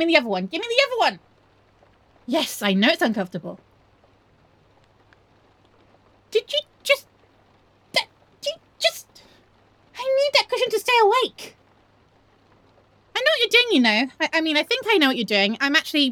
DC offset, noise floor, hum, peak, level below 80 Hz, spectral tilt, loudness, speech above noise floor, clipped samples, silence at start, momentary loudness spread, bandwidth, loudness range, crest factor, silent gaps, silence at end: under 0.1%; -58 dBFS; none; -2 dBFS; -68 dBFS; -3.5 dB/octave; -20 LUFS; 38 dB; under 0.1%; 0 s; 14 LU; over 20 kHz; 9 LU; 22 dB; none; 0 s